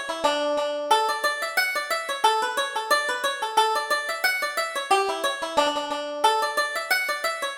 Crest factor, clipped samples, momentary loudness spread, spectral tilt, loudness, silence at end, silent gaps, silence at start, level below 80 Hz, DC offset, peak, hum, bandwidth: 18 dB; under 0.1%; 4 LU; 0.5 dB/octave; -24 LUFS; 0 s; none; 0 s; -66 dBFS; under 0.1%; -6 dBFS; none; over 20 kHz